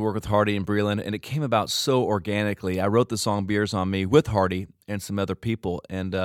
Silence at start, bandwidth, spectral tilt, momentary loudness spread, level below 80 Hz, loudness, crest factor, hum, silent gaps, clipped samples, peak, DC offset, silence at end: 0 s; 17 kHz; -5.5 dB/octave; 9 LU; -52 dBFS; -25 LUFS; 20 dB; none; none; under 0.1%; -4 dBFS; under 0.1%; 0 s